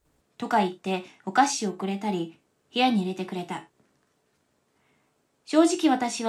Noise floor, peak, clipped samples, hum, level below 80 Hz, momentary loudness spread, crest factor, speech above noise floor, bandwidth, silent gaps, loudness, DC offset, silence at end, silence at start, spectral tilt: -71 dBFS; -8 dBFS; under 0.1%; none; -78 dBFS; 12 LU; 20 dB; 45 dB; 13 kHz; none; -26 LUFS; under 0.1%; 0 s; 0.4 s; -4 dB/octave